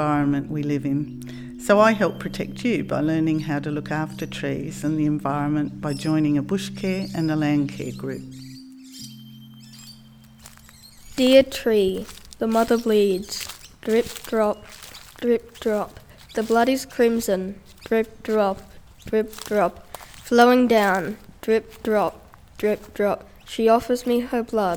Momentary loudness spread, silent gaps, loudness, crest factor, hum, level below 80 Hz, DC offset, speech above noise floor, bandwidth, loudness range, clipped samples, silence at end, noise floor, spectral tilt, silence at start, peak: 19 LU; none; -22 LUFS; 20 dB; none; -50 dBFS; under 0.1%; 26 dB; over 20 kHz; 5 LU; under 0.1%; 0 s; -48 dBFS; -5.5 dB/octave; 0 s; -4 dBFS